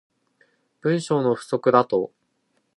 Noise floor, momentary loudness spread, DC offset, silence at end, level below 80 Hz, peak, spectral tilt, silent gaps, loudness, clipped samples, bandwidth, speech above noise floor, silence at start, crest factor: -70 dBFS; 8 LU; under 0.1%; 0.7 s; -70 dBFS; -2 dBFS; -6.5 dB/octave; none; -22 LUFS; under 0.1%; 11.5 kHz; 49 dB; 0.85 s; 22 dB